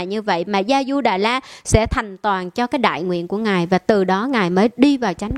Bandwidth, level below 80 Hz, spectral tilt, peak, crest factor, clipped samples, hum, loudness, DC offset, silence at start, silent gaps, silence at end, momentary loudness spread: 13.5 kHz; -36 dBFS; -5.5 dB/octave; 0 dBFS; 18 dB; under 0.1%; none; -18 LUFS; under 0.1%; 0 s; none; 0 s; 6 LU